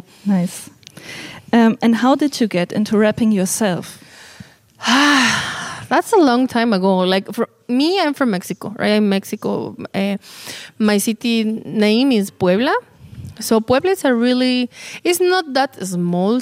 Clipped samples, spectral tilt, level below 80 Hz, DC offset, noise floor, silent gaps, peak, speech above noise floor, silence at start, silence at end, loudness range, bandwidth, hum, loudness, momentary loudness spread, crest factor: under 0.1%; -4.5 dB/octave; -58 dBFS; under 0.1%; -42 dBFS; none; -2 dBFS; 26 dB; 0.25 s; 0 s; 4 LU; 16 kHz; none; -17 LUFS; 13 LU; 14 dB